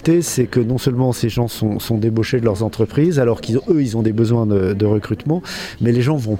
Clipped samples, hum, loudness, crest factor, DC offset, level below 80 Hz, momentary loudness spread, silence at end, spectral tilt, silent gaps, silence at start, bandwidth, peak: under 0.1%; none; -18 LUFS; 14 dB; under 0.1%; -44 dBFS; 5 LU; 0 s; -6.5 dB/octave; none; 0 s; 16.5 kHz; -2 dBFS